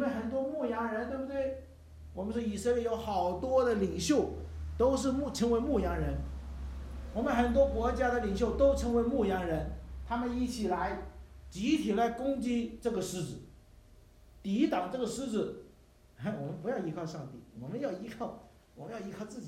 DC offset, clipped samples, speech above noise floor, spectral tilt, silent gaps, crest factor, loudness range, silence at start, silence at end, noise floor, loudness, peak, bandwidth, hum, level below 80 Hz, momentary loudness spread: under 0.1%; under 0.1%; 28 dB; -6 dB/octave; none; 18 dB; 7 LU; 0 s; 0 s; -60 dBFS; -33 LUFS; -16 dBFS; 15.5 kHz; none; -46 dBFS; 15 LU